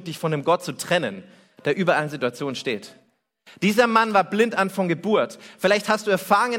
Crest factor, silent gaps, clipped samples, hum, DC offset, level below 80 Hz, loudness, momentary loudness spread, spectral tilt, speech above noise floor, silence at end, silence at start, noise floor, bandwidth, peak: 18 dB; none; under 0.1%; none; under 0.1%; -68 dBFS; -22 LUFS; 10 LU; -5 dB/octave; 34 dB; 0 s; 0 s; -56 dBFS; 17 kHz; -4 dBFS